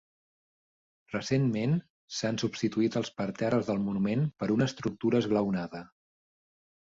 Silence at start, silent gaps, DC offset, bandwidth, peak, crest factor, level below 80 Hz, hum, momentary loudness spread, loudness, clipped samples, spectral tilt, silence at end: 1.1 s; 1.90-2.08 s; under 0.1%; 7.8 kHz; -14 dBFS; 18 dB; -64 dBFS; none; 7 LU; -30 LUFS; under 0.1%; -6.5 dB/octave; 1 s